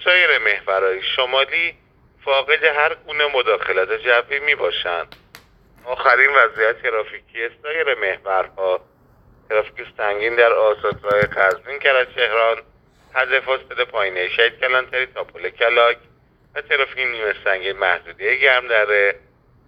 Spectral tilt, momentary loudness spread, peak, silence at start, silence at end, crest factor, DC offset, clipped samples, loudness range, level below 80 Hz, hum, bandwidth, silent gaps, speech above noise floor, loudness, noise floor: -4 dB/octave; 11 LU; 0 dBFS; 0 s; 0.5 s; 20 dB; under 0.1%; under 0.1%; 3 LU; -56 dBFS; none; 8 kHz; none; 34 dB; -18 LUFS; -52 dBFS